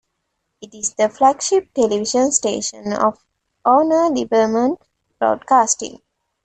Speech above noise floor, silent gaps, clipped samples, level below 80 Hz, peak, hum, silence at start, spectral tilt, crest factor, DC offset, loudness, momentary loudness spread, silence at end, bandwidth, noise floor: 56 dB; none; under 0.1%; -60 dBFS; -2 dBFS; none; 0.6 s; -3 dB/octave; 16 dB; under 0.1%; -17 LUFS; 9 LU; 0.5 s; 9.2 kHz; -73 dBFS